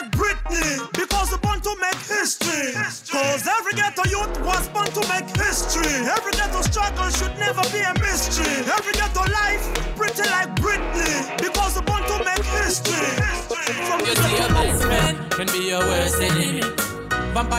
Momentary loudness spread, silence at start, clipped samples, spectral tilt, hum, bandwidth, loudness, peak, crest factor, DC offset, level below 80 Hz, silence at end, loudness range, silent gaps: 4 LU; 0 s; under 0.1%; -3 dB/octave; none; 16 kHz; -21 LUFS; -8 dBFS; 14 dB; under 0.1%; -30 dBFS; 0 s; 2 LU; none